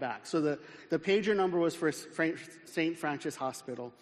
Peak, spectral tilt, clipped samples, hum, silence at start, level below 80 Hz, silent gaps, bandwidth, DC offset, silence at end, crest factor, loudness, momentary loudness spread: -16 dBFS; -5 dB/octave; under 0.1%; none; 0 s; -74 dBFS; none; 13 kHz; under 0.1%; 0.1 s; 16 dB; -33 LUFS; 11 LU